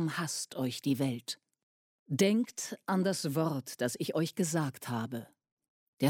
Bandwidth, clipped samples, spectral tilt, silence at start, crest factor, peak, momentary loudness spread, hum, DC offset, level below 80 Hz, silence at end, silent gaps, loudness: 16.5 kHz; under 0.1%; -5 dB/octave; 0 s; 18 dB; -14 dBFS; 10 LU; none; under 0.1%; -78 dBFS; 0 s; 1.63-2.06 s, 5.52-5.57 s, 5.68-5.97 s; -33 LUFS